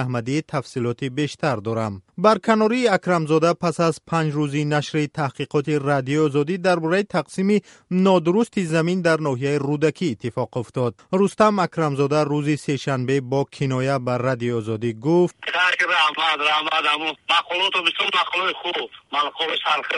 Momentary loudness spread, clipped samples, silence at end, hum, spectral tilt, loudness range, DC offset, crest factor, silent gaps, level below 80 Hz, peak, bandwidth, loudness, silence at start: 7 LU; under 0.1%; 0 s; none; -5.5 dB/octave; 3 LU; under 0.1%; 18 dB; none; -62 dBFS; -2 dBFS; 11.5 kHz; -21 LUFS; 0 s